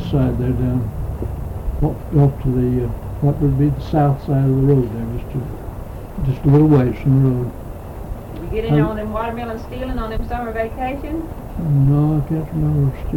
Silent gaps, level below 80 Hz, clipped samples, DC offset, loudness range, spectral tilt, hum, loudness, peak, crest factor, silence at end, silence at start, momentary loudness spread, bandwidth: none; -30 dBFS; under 0.1%; under 0.1%; 5 LU; -10 dB/octave; none; -19 LUFS; -6 dBFS; 12 dB; 0 s; 0 s; 13 LU; 16 kHz